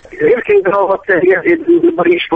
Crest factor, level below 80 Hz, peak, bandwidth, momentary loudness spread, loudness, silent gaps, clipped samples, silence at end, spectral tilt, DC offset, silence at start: 10 dB; -48 dBFS; -2 dBFS; 3.8 kHz; 3 LU; -11 LUFS; none; under 0.1%; 0 s; -7.5 dB/octave; under 0.1%; 0.1 s